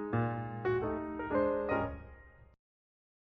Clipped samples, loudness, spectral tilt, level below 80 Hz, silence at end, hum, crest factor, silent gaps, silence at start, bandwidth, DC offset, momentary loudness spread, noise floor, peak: under 0.1%; -35 LUFS; -7.5 dB/octave; -54 dBFS; 0.9 s; none; 16 dB; none; 0 s; 4.9 kHz; under 0.1%; 9 LU; -55 dBFS; -20 dBFS